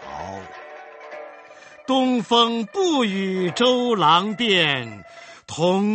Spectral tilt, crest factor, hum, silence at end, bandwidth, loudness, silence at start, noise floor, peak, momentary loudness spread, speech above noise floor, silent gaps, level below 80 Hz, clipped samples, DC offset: -4.5 dB/octave; 20 dB; none; 0 s; 8.8 kHz; -19 LUFS; 0 s; -45 dBFS; -2 dBFS; 22 LU; 25 dB; none; -62 dBFS; under 0.1%; under 0.1%